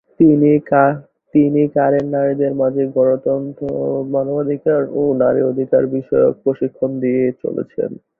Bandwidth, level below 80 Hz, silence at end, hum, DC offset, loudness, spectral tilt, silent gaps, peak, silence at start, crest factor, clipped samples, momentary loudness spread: 3.1 kHz; -56 dBFS; 0.25 s; none; under 0.1%; -16 LUFS; -12 dB/octave; none; -2 dBFS; 0.2 s; 14 dB; under 0.1%; 8 LU